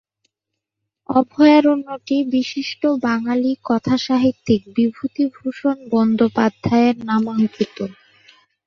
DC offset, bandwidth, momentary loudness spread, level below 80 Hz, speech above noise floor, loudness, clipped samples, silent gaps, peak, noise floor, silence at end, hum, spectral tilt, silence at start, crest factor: under 0.1%; 6.8 kHz; 9 LU; -56 dBFS; 63 dB; -18 LUFS; under 0.1%; none; -2 dBFS; -81 dBFS; 0.75 s; none; -6.5 dB/octave; 1.1 s; 16 dB